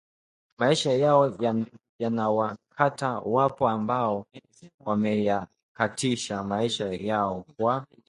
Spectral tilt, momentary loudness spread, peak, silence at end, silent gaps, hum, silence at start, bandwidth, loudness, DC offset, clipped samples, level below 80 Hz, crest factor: -5.5 dB/octave; 9 LU; -4 dBFS; 0.25 s; 1.89-1.99 s, 4.74-4.78 s, 5.63-5.75 s; none; 0.6 s; 11.5 kHz; -26 LUFS; under 0.1%; under 0.1%; -62 dBFS; 22 dB